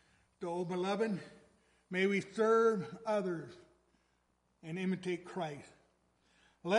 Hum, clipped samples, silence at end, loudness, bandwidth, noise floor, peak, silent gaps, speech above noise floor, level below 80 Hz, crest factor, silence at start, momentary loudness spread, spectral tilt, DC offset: none; under 0.1%; 0 s; -36 LUFS; 11.5 kHz; -77 dBFS; -18 dBFS; none; 42 dB; -78 dBFS; 20 dB; 0.4 s; 16 LU; -6 dB/octave; under 0.1%